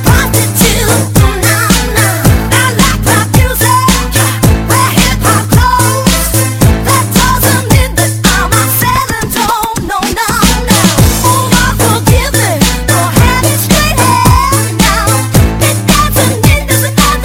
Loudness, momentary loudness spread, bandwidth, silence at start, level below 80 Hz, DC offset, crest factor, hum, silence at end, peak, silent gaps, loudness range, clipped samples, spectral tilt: -8 LUFS; 3 LU; 17 kHz; 0 s; -18 dBFS; under 0.1%; 8 dB; none; 0 s; 0 dBFS; none; 1 LU; 0.5%; -4 dB/octave